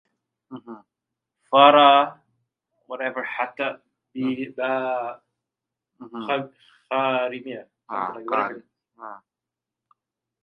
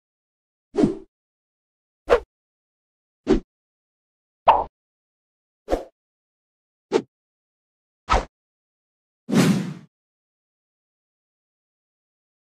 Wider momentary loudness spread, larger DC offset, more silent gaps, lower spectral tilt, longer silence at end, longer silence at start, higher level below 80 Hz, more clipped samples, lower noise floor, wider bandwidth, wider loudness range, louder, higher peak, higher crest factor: first, 26 LU vs 17 LU; neither; second, none vs 1.08-2.05 s, 2.26-3.24 s, 3.44-4.46 s, 4.69-5.66 s, 5.92-6.89 s, 7.08-8.07 s, 8.29-9.27 s; about the same, -7 dB/octave vs -6 dB/octave; second, 1.25 s vs 2.8 s; second, 0.5 s vs 0.75 s; second, -80 dBFS vs -42 dBFS; neither; about the same, -87 dBFS vs under -90 dBFS; second, 4.7 kHz vs 15 kHz; first, 9 LU vs 5 LU; about the same, -21 LUFS vs -23 LUFS; first, 0 dBFS vs -4 dBFS; about the same, 24 dB vs 22 dB